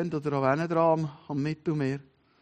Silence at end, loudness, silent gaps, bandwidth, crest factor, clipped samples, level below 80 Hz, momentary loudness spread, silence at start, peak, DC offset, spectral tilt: 0.4 s; -28 LUFS; none; 9 kHz; 18 dB; under 0.1%; -66 dBFS; 8 LU; 0 s; -10 dBFS; under 0.1%; -8 dB/octave